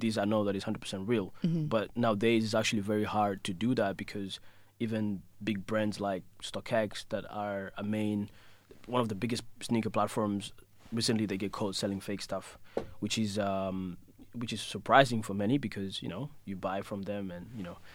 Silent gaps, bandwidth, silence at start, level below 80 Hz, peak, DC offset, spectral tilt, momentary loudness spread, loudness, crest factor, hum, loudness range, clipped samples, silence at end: none; 16.5 kHz; 0 s; -62 dBFS; -6 dBFS; under 0.1%; -5.5 dB/octave; 11 LU; -33 LUFS; 26 dB; none; 4 LU; under 0.1%; 0 s